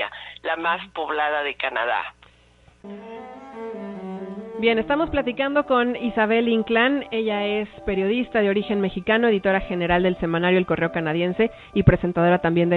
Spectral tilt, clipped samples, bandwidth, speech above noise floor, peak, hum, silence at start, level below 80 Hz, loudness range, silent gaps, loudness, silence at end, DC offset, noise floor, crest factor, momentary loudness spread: -8.5 dB/octave; under 0.1%; 4.6 kHz; 33 dB; 0 dBFS; none; 0 s; -44 dBFS; 7 LU; none; -22 LUFS; 0 s; under 0.1%; -55 dBFS; 22 dB; 14 LU